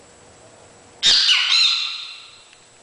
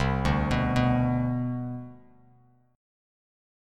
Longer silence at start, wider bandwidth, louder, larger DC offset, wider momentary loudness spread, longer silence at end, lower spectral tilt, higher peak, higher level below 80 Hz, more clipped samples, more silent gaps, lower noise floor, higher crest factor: first, 1 s vs 0 s; about the same, 10.5 kHz vs 10 kHz; first, -15 LUFS vs -27 LUFS; neither; first, 16 LU vs 13 LU; second, 0.55 s vs 1.8 s; second, 2.5 dB/octave vs -7.5 dB/octave; first, 0 dBFS vs -10 dBFS; second, -60 dBFS vs -40 dBFS; neither; neither; second, -48 dBFS vs -61 dBFS; about the same, 20 dB vs 18 dB